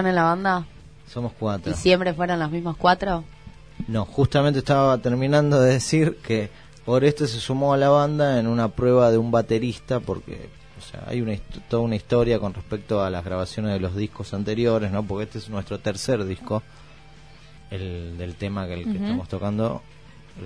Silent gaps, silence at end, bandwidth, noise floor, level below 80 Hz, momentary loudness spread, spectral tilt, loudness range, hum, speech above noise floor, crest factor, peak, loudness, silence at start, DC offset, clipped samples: none; 0 s; 11 kHz; -48 dBFS; -46 dBFS; 14 LU; -6.5 dB/octave; 9 LU; none; 25 dB; 18 dB; -4 dBFS; -23 LUFS; 0 s; 0.3%; under 0.1%